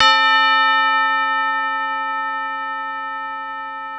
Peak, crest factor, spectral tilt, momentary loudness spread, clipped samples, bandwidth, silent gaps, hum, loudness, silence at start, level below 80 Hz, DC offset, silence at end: 0 dBFS; 18 dB; 0 dB/octave; 13 LU; under 0.1%; 9.8 kHz; none; 50 Hz at -70 dBFS; -18 LUFS; 0 s; -64 dBFS; under 0.1%; 0 s